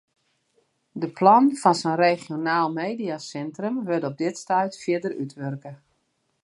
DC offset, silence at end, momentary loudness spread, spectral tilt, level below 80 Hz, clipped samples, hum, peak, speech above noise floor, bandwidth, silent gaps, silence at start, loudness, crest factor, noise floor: under 0.1%; 0.7 s; 16 LU; -5.5 dB/octave; -76 dBFS; under 0.1%; none; -4 dBFS; 49 dB; 11.5 kHz; none; 0.95 s; -23 LUFS; 20 dB; -72 dBFS